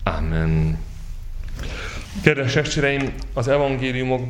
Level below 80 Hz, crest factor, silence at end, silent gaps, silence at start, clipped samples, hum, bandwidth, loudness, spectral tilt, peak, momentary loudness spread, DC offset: -30 dBFS; 22 dB; 0 s; none; 0 s; under 0.1%; none; 12 kHz; -22 LUFS; -6 dB/octave; 0 dBFS; 17 LU; under 0.1%